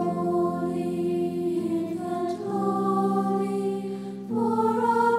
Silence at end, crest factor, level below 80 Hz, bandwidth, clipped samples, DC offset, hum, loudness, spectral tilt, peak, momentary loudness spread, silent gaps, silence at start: 0 s; 14 dB; -68 dBFS; 14 kHz; under 0.1%; under 0.1%; none; -26 LUFS; -8 dB/octave; -12 dBFS; 6 LU; none; 0 s